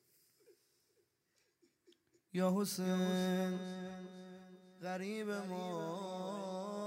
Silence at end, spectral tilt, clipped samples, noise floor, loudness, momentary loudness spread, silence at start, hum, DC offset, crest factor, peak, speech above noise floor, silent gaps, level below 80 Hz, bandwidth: 0 s; -5.5 dB/octave; under 0.1%; -80 dBFS; -39 LUFS; 16 LU; 0.5 s; none; under 0.1%; 18 dB; -22 dBFS; 42 dB; none; -86 dBFS; 16 kHz